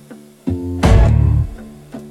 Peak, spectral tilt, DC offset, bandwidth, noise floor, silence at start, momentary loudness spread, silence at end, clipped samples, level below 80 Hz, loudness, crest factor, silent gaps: 0 dBFS; -7.5 dB/octave; under 0.1%; 12.5 kHz; -33 dBFS; 0.1 s; 22 LU; 0 s; under 0.1%; -20 dBFS; -15 LUFS; 14 dB; none